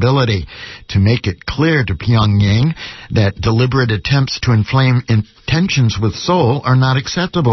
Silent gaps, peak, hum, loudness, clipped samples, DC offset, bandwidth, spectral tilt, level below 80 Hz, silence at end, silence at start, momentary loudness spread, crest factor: none; -2 dBFS; none; -15 LUFS; under 0.1%; under 0.1%; 6.2 kHz; -6.5 dB/octave; -34 dBFS; 0 s; 0 s; 6 LU; 12 dB